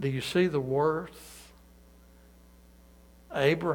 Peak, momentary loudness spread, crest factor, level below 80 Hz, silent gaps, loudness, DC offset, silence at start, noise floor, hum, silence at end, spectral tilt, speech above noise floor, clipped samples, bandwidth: -12 dBFS; 21 LU; 20 dB; -58 dBFS; none; -28 LUFS; under 0.1%; 0 s; -56 dBFS; 60 Hz at -55 dBFS; 0 s; -6 dB/octave; 28 dB; under 0.1%; 19 kHz